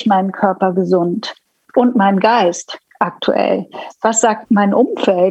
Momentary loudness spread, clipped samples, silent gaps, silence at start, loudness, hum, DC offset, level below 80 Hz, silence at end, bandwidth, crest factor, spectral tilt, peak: 9 LU; under 0.1%; none; 0 s; -15 LUFS; none; under 0.1%; -66 dBFS; 0 s; 9.2 kHz; 14 dB; -5 dB/octave; 0 dBFS